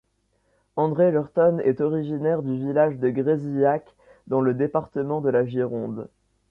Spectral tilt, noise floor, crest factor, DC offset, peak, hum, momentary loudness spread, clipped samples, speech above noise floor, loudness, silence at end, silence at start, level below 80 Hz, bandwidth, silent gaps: -11 dB/octave; -69 dBFS; 16 dB; under 0.1%; -8 dBFS; none; 8 LU; under 0.1%; 46 dB; -23 LUFS; 0.45 s; 0.75 s; -62 dBFS; 4.1 kHz; none